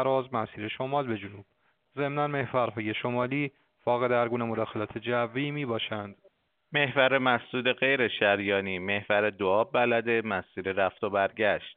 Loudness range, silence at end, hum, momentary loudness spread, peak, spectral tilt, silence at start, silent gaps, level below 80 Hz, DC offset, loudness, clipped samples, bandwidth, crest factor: 5 LU; 0.05 s; none; 10 LU; -8 dBFS; -3 dB/octave; 0 s; none; -70 dBFS; under 0.1%; -28 LUFS; under 0.1%; 4.6 kHz; 20 dB